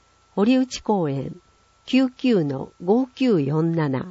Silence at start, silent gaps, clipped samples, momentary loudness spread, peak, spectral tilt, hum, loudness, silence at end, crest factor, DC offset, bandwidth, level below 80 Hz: 0.35 s; none; under 0.1%; 9 LU; -6 dBFS; -7 dB/octave; none; -22 LUFS; 0 s; 14 dB; under 0.1%; 7.8 kHz; -58 dBFS